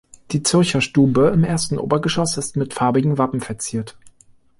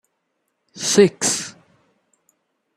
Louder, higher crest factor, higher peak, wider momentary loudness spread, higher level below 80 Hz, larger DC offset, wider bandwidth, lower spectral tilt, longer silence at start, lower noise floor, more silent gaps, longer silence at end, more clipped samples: about the same, -19 LUFS vs -18 LUFS; second, 16 dB vs 22 dB; about the same, -4 dBFS vs -2 dBFS; about the same, 10 LU vs 12 LU; first, -48 dBFS vs -66 dBFS; neither; second, 11.5 kHz vs 14.5 kHz; first, -5 dB/octave vs -3 dB/octave; second, 0.3 s vs 0.75 s; second, -52 dBFS vs -73 dBFS; neither; second, 0.5 s vs 1.25 s; neither